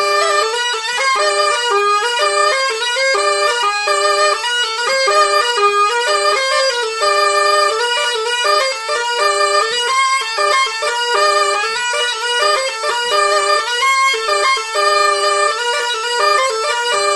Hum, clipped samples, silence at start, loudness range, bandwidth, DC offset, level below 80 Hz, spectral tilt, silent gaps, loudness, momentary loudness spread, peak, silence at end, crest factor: none; under 0.1%; 0 s; 1 LU; 12 kHz; under 0.1%; -64 dBFS; 2 dB/octave; none; -14 LUFS; 4 LU; 0 dBFS; 0 s; 14 dB